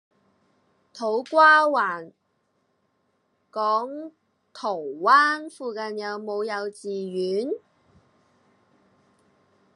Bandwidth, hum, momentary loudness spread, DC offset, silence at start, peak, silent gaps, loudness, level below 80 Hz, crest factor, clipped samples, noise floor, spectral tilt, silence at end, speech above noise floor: 11.5 kHz; none; 18 LU; under 0.1%; 0.95 s; -4 dBFS; none; -23 LUFS; -84 dBFS; 22 dB; under 0.1%; -71 dBFS; -4 dB/octave; 2.2 s; 48 dB